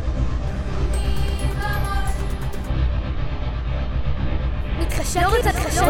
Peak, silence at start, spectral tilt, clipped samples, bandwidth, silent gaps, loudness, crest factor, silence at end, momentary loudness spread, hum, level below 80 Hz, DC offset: -4 dBFS; 0 s; -5 dB/octave; under 0.1%; 17 kHz; none; -24 LUFS; 16 dB; 0 s; 8 LU; none; -24 dBFS; under 0.1%